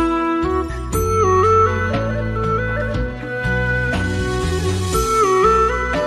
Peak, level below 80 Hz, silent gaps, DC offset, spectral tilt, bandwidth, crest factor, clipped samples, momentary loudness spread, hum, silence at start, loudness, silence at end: -4 dBFS; -28 dBFS; none; under 0.1%; -5.5 dB/octave; 13.5 kHz; 14 dB; under 0.1%; 8 LU; none; 0 s; -18 LUFS; 0 s